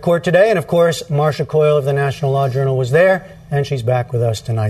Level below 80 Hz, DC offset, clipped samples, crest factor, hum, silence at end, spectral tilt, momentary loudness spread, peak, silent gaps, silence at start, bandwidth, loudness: -48 dBFS; under 0.1%; under 0.1%; 14 dB; none; 0 s; -6.5 dB/octave; 6 LU; 0 dBFS; none; 0 s; 13.5 kHz; -16 LUFS